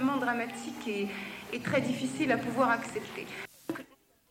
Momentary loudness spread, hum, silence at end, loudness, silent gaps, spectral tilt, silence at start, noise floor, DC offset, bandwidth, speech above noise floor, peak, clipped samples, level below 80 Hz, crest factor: 13 LU; none; 0.45 s; -33 LUFS; none; -5 dB/octave; 0 s; -55 dBFS; under 0.1%; 16.5 kHz; 22 dB; -14 dBFS; under 0.1%; -68 dBFS; 20 dB